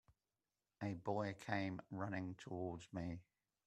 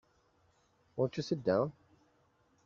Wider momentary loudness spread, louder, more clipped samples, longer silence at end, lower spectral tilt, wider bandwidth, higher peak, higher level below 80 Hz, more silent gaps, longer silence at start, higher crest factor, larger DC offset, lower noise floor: about the same, 6 LU vs 7 LU; second, -46 LUFS vs -35 LUFS; neither; second, 0.45 s vs 0.95 s; about the same, -7 dB/octave vs -6.5 dB/octave; first, 12 kHz vs 7.6 kHz; second, -24 dBFS vs -16 dBFS; about the same, -74 dBFS vs -74 dBFS; neither; second, 0.8 s vs 0.95 s; about the same, 22 dB vs 22 dB; neither; first, under -90 dBFS vs -71 dBFS